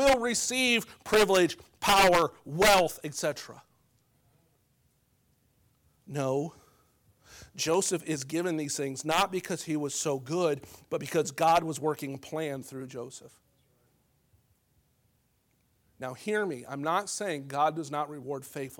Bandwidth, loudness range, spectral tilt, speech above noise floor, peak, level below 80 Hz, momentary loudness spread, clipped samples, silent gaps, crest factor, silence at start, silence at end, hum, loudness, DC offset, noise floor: 19 kHz; 16 LU; -3.5 dB/octave; 42 dB; -10 dBFS; -56 dBFS; 17 LU; under 0.1%; none; 22 dB; 0 s; 0.05 s; none; -28 LUFS; under 0.1%; -71 dBFS